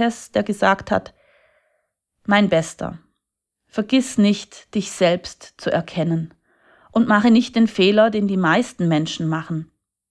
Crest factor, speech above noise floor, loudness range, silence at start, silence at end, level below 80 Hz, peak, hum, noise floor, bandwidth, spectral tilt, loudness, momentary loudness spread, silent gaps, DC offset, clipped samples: 18 dB; 62 dB; 5 LU; 0 s; 0.45 s; -56 dBFS; -2 dBFS; none; -80 dBFS; 11 kHz; -5.5 dB/octave; -19 LUFS; 14 LU; none; under 0.1%; under 0.1%